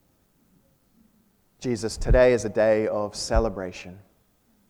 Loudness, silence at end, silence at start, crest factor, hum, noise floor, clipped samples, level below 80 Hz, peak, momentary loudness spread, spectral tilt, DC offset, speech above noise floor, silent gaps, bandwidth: -24 LUFS; 0.7 s; 1.6 s; 18 dB; none; -64 dBFS; under 0.1%; -34 dBFS; -8 dBFS; 16 LU; -5.5 dB/octave; under 0.1%; 42 dB; none; 12.5 kHz